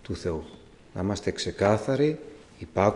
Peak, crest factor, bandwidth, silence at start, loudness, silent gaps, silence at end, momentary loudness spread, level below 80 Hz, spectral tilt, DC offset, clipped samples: -6 dBFS; 20 dB; 11 kHz; 0.1 s; -28 LUFS; none; 0 s; 19 LU; -54 dBFS; -6 dB/octave; under 0.1%; under 0.1%